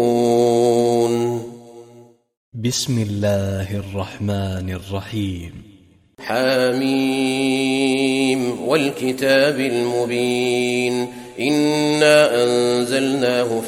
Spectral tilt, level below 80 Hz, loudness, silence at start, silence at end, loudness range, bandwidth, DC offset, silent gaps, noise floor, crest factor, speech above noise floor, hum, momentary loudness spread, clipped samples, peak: -5 dB/octave; -54 dBFS; -19 LUFS; 0 s; 0 s; 7 LU; 16 kHz; under 0.1%; 2.37-2.52 s; -49 dBFS; 16 dB; 31 dB; none; 11 LU; under 0.1%; -2 dBFS